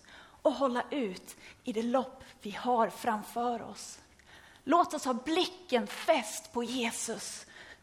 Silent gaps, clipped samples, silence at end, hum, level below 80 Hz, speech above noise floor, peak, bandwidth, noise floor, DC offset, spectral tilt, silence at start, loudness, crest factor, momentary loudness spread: none; under 0.1%; 0.1 s; none; -68 dBFS; 24 dB; -12 dBFS; 16 kHz; -57 dBFS; under 0.1%; -3 dB/octave; 0.1 s; -32 LUFS; 20 dB; 15 LU